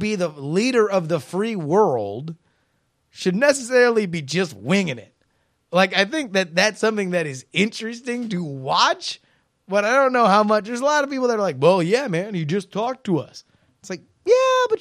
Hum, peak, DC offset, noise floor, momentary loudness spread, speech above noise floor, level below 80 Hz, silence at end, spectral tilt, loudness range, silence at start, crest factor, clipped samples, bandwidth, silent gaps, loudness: none; 0 dBFS; under 0.1%; -68 dBFS; 11 LU; 48 dB; -68 dBFS; 0 s; -4.5 dB/octave; 3 LU; 0 s; 20 dB; under 0.1%; 14.5 kHz; none; -20 LUFS